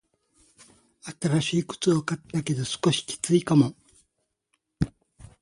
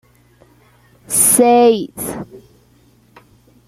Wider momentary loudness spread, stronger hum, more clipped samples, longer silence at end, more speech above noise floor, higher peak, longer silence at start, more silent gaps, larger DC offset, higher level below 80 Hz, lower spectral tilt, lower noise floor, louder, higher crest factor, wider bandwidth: second, 10 LU vs 19 LU; second, none vs 60 Hz at -35 dBFS; neither; second, 0.2 s vs 1.3 s; first, 52 dB vs 38 dB; second, -8 dBFS vs 0 dBFS; about the same, 1.05 s vs 1.1 s; neither; neither; about the same, -52 dBFS vs -52 dBFS; first, -5.5 dB/octave vs -3 dB/octave; first, -77 dBFS vs -52 dBFS; second, -26 LUFS vs -12 LUFS; about the same, 20 dB vs 18 dB; second, 11.5 kHz vs 16 kHz